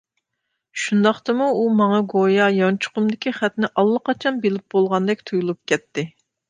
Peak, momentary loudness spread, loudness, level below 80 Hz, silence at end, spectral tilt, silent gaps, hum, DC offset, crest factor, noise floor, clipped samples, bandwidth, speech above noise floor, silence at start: -2 dBFS; 7 LU; -20 LUFS; -68 dBFS; 0.4 s; -6 dB/octave; none; none; under 0.1%; 18 dB; -77 dBFS; under 0.1%; 9.6 kHz; 58 dB; 0.75 s